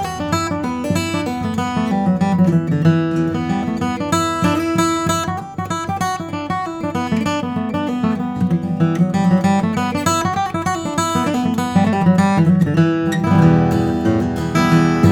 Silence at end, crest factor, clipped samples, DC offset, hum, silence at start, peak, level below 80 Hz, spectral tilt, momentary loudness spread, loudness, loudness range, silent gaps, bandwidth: 0 s; 16 dB; under 0.1%; under 0.1%; none; 0 s; 0 dBFS; -46 dBFS; -6.5 dB/octave; 7 LU; -17 LUFS; 5 LU; none; 17 kHz